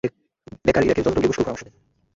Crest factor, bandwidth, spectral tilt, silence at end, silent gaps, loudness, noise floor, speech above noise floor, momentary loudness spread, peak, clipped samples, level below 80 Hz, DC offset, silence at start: 18 dB; 7.8 kHz; -6 dB/octave; 0.55 s; none; -21 LUFS; -46 dBFS; 26 dB; 10 LU; -4 dBFS; under 0.1%; -44 dBFS; under 0.1%; 0.05 s